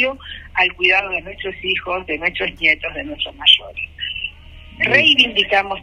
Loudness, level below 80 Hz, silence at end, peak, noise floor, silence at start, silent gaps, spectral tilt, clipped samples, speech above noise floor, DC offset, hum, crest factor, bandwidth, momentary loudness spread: -16 LUFS; -44 dBFS; 0 s; 0 dBFS; -39 dBFS; 0 s; none; -3.5 dB/octave; under 0.1%; 21 dB; under 0.1%; none; 18 dB; 12 kHz; 14 LU